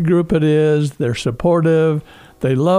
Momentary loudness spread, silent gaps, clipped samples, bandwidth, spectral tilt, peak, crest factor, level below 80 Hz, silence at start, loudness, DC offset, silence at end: 6 LU; none; under 0.1%; 11.5 kHz; -7.5 dB/octave; -4 dBFS; 12 dB; -42 dBFS; 0 s; -16 LUFS; under 0.1%; 0 s